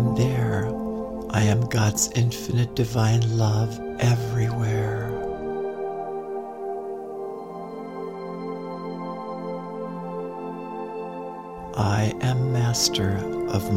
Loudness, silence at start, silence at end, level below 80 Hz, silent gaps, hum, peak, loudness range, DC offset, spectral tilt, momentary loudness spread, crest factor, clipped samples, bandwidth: -26 LUFS; 0 s; 0 s; -48 dBFS; none; none; -6 dBFS; 10 LU; 0.1%; -5.5 dB/octave; 12 LU; 18 dB; under 0.1%; 16 kHz